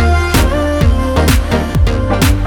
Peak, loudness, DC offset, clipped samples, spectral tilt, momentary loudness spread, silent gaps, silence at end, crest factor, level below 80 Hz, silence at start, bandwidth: 0 dBFS; -13 LUFS; under 0.1%; under 0.1%; -5.5 dB/octave; 2 LU; none; 0 s; 10 dB; -14 dBFS; 0 s; 19 kHz